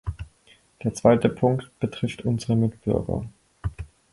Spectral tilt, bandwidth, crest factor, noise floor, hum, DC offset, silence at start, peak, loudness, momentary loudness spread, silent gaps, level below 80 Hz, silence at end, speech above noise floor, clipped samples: -7.5 dB/octave; 11.5 kHz; 22 dB; -58 dBFS; none; under 0.1%; 0.05 s; -4 dBFS; -25 LUFS; 19 LU; none; -42 dBFS; 0.25 s; 35 dB; under 0.1%